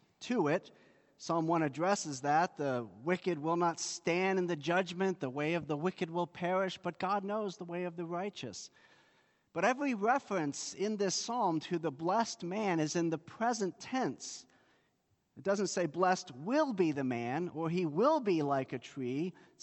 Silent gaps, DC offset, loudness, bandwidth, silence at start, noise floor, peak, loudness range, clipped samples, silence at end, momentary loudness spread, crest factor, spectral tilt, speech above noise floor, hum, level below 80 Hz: none; under 0.1%; -34 LUFS; 8.4 kHz; 0.2 s; -77 dBFS; -16 dBFS; 4 LU; under 0.1%; 0.3 s; 8 LU; 18 dB; -5 dB/octave; 43 dB; none; -80 dBFS